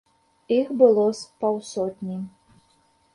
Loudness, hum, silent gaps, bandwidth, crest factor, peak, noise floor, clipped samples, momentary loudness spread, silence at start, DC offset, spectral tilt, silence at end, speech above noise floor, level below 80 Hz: -23 LUFS; none; none; 11.5 kHz; 20 dB; -4 dBFS; -63 dBFS; under 0.1%; 15 LU; 0.5 s; under 0.1%; -6.5 dB/octave; 0.85 s; 41 dB; -68 dBFS